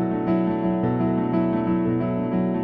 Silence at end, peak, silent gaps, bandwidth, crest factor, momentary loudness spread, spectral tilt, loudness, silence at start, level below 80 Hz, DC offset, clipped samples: 0 s; -10 dBFS; none; 4.7 kHz; 12 dB; 1 LU; -12 dB/octave; -23 LUFS; 0 s; -50 dBFS; under 0.1%; under 0.1%